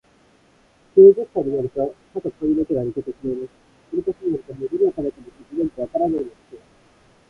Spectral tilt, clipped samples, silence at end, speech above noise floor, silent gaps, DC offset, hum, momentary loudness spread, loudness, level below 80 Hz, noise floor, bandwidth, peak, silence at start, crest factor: -10 dB/octave; under 0.1%; 0.7 s; 36 dB; none; under 0.1%; none; 18 LU; -20 LUFS; -54 dBFS; -56 dBFS; 3.2 kHz; -2 dBFS; 0.95 s; 20 dB